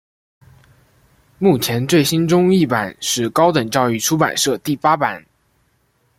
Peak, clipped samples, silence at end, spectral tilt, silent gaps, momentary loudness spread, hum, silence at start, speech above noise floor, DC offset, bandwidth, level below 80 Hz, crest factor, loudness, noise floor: 0 dBFS; under 0.1%; 1 s; -4.5 dB/octave; none; 5 LU; none; 1.4 s; 46 dB; under 0.1%; 16.5 kHz; -54 dBFS; 18 dB; -16 LUFS; -62 dBFS